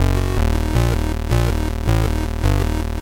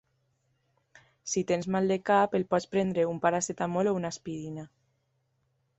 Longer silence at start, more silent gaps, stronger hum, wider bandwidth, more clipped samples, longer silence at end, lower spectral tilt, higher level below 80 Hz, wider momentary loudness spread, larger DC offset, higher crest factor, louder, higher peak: second, 0 s vs 1.25 s; neither; neither; first, 17 kHz vs 8.2 kHz; neither; second, 0 s vs 1.15 s; first, -6.5 dB/octave vs -5 dB/octave; first, -20 dBFS vs -66 dBFS; second, 3 LU vs 13 LU; neither; second, 10 dB vs 20 dB; first, -20 LUFS vs -29 LUFS; first, -6 dBFS vs -10 dBFS